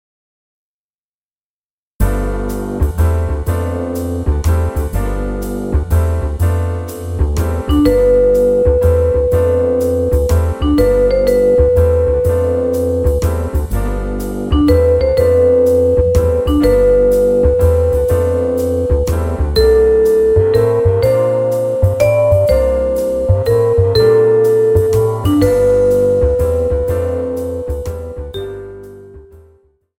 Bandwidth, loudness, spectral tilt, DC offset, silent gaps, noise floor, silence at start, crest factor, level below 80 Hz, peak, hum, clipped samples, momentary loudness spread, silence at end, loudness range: 16.5 kHz; -14 LUFS; -7.5 dB/octave; under 0.1%; none; under -90 dBFS; 2 s; 12 dB; -22 dBFS; 0 dBFS; none; under 0.1%; 10 LU; 0.75 s; 6 LU